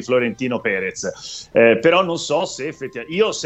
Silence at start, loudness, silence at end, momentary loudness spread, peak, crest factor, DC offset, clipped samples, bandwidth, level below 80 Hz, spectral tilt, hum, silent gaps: 0 s; -19 LUFS; 0 s; 14 LU; -2 dBFS; 18 dB; under 0.1%; under 0.1%; 8.4 kHz; -58 dBFS; -4 dB/octave; none; none